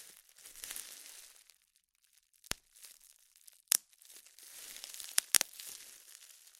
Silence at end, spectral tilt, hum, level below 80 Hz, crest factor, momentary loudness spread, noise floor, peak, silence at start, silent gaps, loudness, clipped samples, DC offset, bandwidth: 0.1 s; 2 dB/octave; none; -72 dBFS; 42 dB; 25 LU; -75 dBFS; 0 dBFS; 0 s; none; -35 LUFS; under 0.1%; under 0.1%; 16.5 kHz